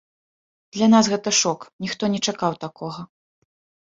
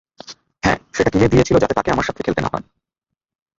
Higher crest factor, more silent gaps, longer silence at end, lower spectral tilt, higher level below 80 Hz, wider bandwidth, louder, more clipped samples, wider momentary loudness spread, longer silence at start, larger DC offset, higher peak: about the same, 20 dB vs 18 dB; first, 1.73-1.79 s vs none; second, 0.8 s vs 1 s; second, -3.5 dB/octave vs -6 dB/octave; second, -64 dBFS vs -38 dBFS; about the same, 7.8 kHz vs 7.8 kHz; about the same, -20 LUFS vs -18 LUFS; neither; about the same, 17 LU vs 19 LU; first, 0.75 s vs 0.3 s; neither; about the same, -2 dBFS vs -2 dBFS